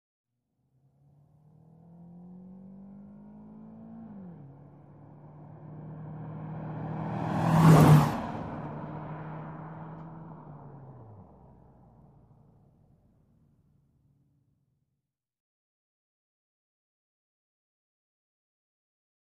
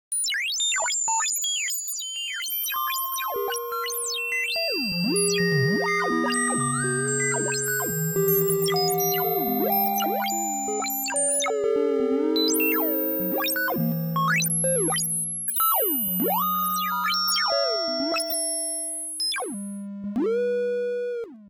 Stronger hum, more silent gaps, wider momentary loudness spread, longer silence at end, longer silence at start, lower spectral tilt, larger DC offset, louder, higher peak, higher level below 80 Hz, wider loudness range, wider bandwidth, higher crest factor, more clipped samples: neither; neither; first, 29 LU vs 6 LU; first, 8 s vs 0 s; first, 2 s vs 0.1 s; first, -7.5 dB/octave vs -2.5 dB/octave; neither; second, -26 LUFS vs -23 LUFS; about the same, -8 dBFS vs -10 dBFS; first, -58 dBFS vs -66 dBFS; first, 24 LU vs 3 LU; second, 13 kHz vs 17 kHz; first, 24 dB vs 14 dB; neither